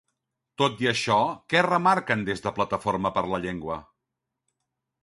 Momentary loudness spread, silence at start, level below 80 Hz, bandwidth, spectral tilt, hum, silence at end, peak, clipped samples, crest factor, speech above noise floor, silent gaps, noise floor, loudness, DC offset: 9 LU; 0.6 s; -56 dBFS; 11.5 kHz; -5 dB/octave; none; 1.2 s; -4 dBFS; under 0.1%; 22 dB; 59 dB; none; -84 dBFS; -25 LUFS; under 0.1%